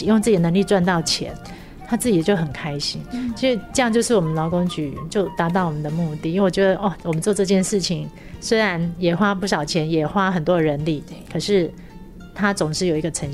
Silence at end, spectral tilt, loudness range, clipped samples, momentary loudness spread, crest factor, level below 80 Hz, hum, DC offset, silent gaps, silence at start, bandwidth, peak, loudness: 0 s; -5 dB/octave; 1 LU; under 0.1%; 10 LU; 16 dB; -44 dBFS; none; under 0.1%; none; 0 s; 14.5 kHz; -6 dBFS; -21 LUFS